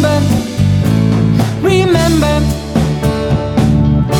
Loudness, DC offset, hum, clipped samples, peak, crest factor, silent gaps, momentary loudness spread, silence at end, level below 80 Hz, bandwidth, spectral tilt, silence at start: -12 LUFS; under 0.1%; none; under 0.1%; 0 dBFS; 12 dB; none; 4 LU; 0 s; -24 dBFS; 17.5 kHz; -6.5 dB/octave; 0 s